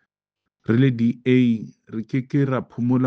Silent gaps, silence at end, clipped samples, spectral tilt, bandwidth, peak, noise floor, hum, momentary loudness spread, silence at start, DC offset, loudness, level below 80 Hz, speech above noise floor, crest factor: none; 0 s; under 0.1%; -9.5 dB/octave; 6.4 kHz; -4 dBFS; -83 dBFS; none; 13 LU; 0.7 s; under 0.1%; -21 LUFS; -62 dBFS; 63 dB; 16 dB